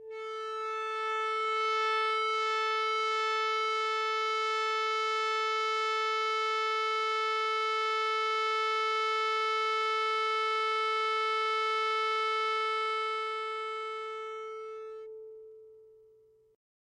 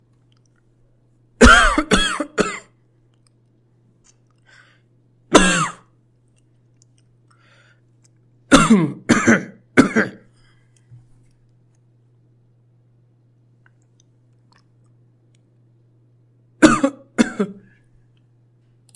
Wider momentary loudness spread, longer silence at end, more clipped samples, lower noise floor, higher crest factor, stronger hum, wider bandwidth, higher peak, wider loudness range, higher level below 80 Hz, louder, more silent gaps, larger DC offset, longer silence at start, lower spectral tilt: second, 9 LU vs 12 LU; second, 0.95 s vs 1.45 s; neither; first, -63 dBFS vs -58 dBFS; second, 12 dB vs 22 dB; neither; about the same, 12.5 kHz vs 11.5 kHz; second, -20 dBFS vs 0 dBFS; about the same, 6 LU vs 7 LU; second, -88 dBFS vs -34 dBFS; second, -30 LUFS vs -16 LUFS; neither; neither; second, 0 s vs 1.4 s; second, 1.5 dB/octave vs -4 dB/octave